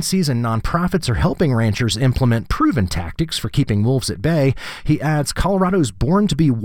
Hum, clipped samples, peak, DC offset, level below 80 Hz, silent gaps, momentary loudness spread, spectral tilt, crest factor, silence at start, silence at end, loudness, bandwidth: none; under 0.1%; -4 dBFS; 1%; -32 dBFS; none; 4 LU; -6 dB/octave; 12 dB; 0 s; 0 s; -18 LUFS; 17.5 kHz